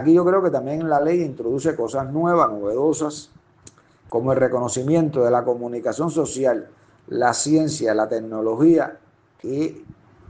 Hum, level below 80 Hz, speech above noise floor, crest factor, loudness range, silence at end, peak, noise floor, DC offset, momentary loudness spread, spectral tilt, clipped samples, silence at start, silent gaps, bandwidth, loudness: none; -60 dBFS; 31 dB; 16 dB; 2 LU; 0.4 s; -4 dBFS; -51 dBFS; under 0.1%; 9 LU; -6 dB/octave; under 0.1%; 0 s; none; 9.8 kHz; -21 LUFS